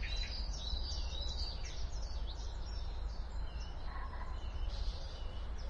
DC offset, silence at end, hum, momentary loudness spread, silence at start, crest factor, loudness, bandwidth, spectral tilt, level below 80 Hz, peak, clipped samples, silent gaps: under 0.1%; 0 s; none; 6 LU; 0 s; 12 dB; -44 LUFS; 7.8 kHz; -4 dB/octave; -40 dBFS; -26 dBFS; under 0.1%; none